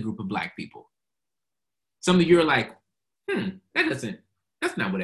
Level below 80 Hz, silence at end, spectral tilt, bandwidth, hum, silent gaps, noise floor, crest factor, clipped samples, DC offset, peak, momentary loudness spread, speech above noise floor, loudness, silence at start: -58 dBFS; 0 s; -5.5 dB/octave; 12 kHz; none; none; -89 dBFS; 20 dB; under 0.1%; under 0.1%; -6 dBFS; 20 LU; 65 dB; -24 LUFS; 0 s